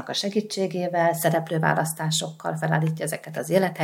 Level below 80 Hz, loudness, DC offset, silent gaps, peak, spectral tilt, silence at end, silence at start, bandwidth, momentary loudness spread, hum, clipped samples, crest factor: -76 dBFS; -25 LUFS; under 0.1%; none; -4 dBFS; -4.5 dB/octave; 0 s; 0 s; 17 kHz; 7 LU; none; under 0.1%; 20 dB